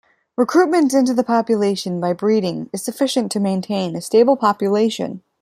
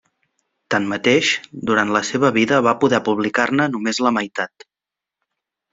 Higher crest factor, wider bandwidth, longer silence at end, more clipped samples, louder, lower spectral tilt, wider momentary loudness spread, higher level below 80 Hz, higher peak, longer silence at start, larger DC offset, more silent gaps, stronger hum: about the same, 16 dB vs 18 dB; first, 15.5 kHz vs 7.8 kHz; second, 0.25 s vs 1.25 s; neither; about the same, -18 LUFS vs -18 LUFS; first, -5.5 dB/octave vs -4 dB/octave; about the same, 9 LU vs 7 LU; second, -66 dBFS vs -60 dBFS; about the same, -2 dBFS vs -2 dBFS; second, 0.4 s vs 0.7 s; neither; neither; neither